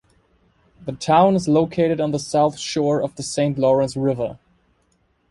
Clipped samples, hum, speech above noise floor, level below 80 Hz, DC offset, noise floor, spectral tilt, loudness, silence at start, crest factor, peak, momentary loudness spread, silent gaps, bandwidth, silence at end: under 0.1%; none; 45 dB; -54 dBFS; under 0.1%; -64 dBFS; -6 dB/octave; -20 LUFS; 0.8 s; 18 dB; -2 dBFS; 11 LU; none; 11.5 kHz; 0.95 s